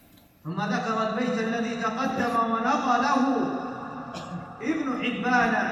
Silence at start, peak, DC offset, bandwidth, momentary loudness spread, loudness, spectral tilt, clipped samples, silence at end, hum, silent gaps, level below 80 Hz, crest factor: 0.45 s; -10 dBFS; under 0.1%; 13 kHz; 14 LU; -26 LUFS; -5.5 dB/octave; under 0.1%; 0 s; none; none; -62 dBFS; 16 dB